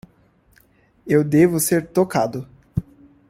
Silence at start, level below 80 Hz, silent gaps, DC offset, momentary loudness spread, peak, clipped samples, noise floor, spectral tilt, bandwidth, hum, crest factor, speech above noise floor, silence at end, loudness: 1.05 s; -48 dBFS; none; under 0.1%; 14 LU; -2 dBFS; under 0.1%; -57 dBFS; -6 dB/octave; 16.5 kHz; none; 18 dB; 39 dB; 0.5 s; -19 LUFS